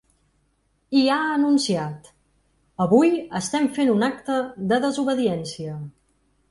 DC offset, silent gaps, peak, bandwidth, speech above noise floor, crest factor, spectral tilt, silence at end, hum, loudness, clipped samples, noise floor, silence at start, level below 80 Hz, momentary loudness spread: under 0.1%; none; -4 dBFS; 11.5 kHz; 46 dB; 18 dB; -5 dB/octave; 0.6 s; none; -22 LUFS; under 0.1%; -67 dBFS; 0.9 s; -62 dBFS; 15 LU